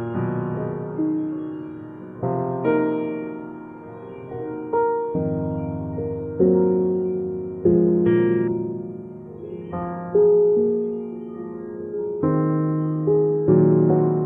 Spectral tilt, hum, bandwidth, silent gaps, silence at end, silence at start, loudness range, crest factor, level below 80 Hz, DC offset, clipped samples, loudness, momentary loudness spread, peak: -13 dB/octave; none; 3.5 kHz; none; 0 s; 0 s; 6 LU; 16 dB; -54 dBFS; under 0.1%; under 0.1%; -22 LUFS; 17 LU; -6 dBFS